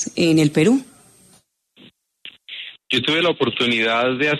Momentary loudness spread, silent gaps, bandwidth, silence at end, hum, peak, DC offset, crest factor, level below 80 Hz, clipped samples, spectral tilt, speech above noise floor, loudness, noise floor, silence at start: 17 LU; none; 13 kHz; 0 s; none; -4 dBFS; under 0.1%; 16 dB; -62 dBFS; under 0.1%; -4.5 dB/octave; 39 dB; -18 LUFS; -56 dBFS; 0 s